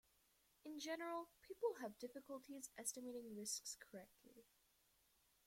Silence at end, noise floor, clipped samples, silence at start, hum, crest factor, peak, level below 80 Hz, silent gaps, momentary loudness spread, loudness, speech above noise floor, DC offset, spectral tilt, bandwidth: 1.05 s; -80 dBFS; under 0.1%; 0.65 s; none; 22 dB; -32 dBFS; -88 dBFS; none; 14 LU; -50 LUFS; 29 dB; under 0.1%; -2 dB/octave; 16.5 kHz